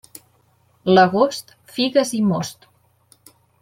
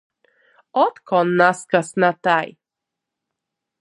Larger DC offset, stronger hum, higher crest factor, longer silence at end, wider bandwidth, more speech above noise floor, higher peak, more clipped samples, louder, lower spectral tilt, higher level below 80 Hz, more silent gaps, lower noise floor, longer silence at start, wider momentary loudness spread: neither; neither; about the same, 20 dB vs 20 dB; second, 1.1 s vs 1.35 s; first, 16 kHz vs 11.5 kHz; second, 42 dB vs 66 dB; about the same, -2 dBFS vs 0 dBFS; neither; about the same, -18 LUFS vs -19 LUFS; about the same, -5 dB/octave vs -5.5 dB/octave; first, -64 dBFS vs -72 dBFS; neither; second, -59 dBFS vs -84 dBFS; about the same, 0.85 s vs 0.75 s; first, 17 LU vs 5 LU